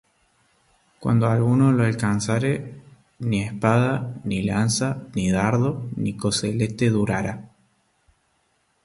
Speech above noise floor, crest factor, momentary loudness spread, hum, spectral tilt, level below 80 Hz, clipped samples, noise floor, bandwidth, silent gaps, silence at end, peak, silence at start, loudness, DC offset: 46 dB; 20 dB; 9 LU; none; -6 dB/octave; -50 dBFS; under 0.1%; -67 dBFS; 11.5 kHz; none; 1.4 s; -4 dBFS; 1 s; -22 LUFS; under 0.1%